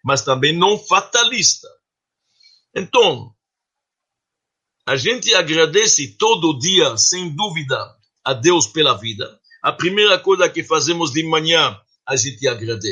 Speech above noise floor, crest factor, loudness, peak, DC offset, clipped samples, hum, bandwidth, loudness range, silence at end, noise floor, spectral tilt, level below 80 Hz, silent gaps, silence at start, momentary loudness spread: 66 dB; 18 dB; -16 LUFS; 0 dBFS; under 0.1%; under 0.1%; none; 10.5 kHz; 5 LU; 0 s; -82 dBFS; -2 dB/octave; -62 dBFS; none; 0.05 s; 11 LU